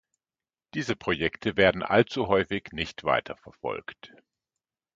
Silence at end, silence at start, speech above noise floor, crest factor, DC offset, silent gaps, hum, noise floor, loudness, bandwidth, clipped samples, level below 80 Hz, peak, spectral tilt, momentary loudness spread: 0.9 s; 0.75 s; over 63 dB; 24 dB; under 0.1%; none; none; under -90 dBFS; -27 LUFS; 7.8 kHz; under 0.1%; -54 dBFS; -4 dBFS; -5.5 dB/octave; 14 LU